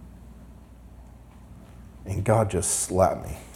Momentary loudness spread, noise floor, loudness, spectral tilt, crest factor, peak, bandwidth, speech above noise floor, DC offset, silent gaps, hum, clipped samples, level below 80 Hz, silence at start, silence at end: 25 LU; -47 dBFS; -24 LUFS; -5 dB/octave; 22 dB; -6 dBFS; 16.5 kHz; 23 dB; under 0.1%; none; 60 Hz at -50 dBFS; under 0.1%; -46 dBFS; 0 s; 0 s